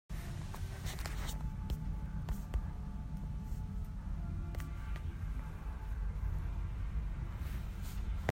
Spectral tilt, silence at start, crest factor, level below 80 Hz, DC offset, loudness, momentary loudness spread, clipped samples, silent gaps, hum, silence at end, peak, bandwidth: -6 dB/octave; 0.1 s; 22 dB; -40 dBFS; under 0.1%; -43 LUFS; 4 LU; under 0.1%; none; none; 0 s; -18 dBFS; 16 kHz